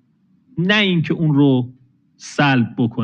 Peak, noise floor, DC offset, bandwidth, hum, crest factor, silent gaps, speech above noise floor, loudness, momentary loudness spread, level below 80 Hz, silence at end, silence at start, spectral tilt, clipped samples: -2 dBFS; -58 dBFS; under 0.1%; 9.2 kHz; none; 16 dB; none; 41 dB; -17 LUFS; 16 LU; -60 dBFS; 0 s; 0.55 s; -6.5 dB/octave; under 0.1%